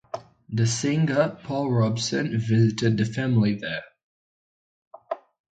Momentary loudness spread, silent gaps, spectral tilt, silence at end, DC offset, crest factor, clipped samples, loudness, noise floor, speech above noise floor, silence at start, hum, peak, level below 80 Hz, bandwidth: 14 LU; 4.03-4.91 s; -6 dB/octave; 0.35 s; under 0.1%; 16 dB; under 0.1%; -24 LUFS; under -90 dBFS; over 67 dB; 0.15 s; none; -8 dBFS; -58 dBFS; 9.2 kHz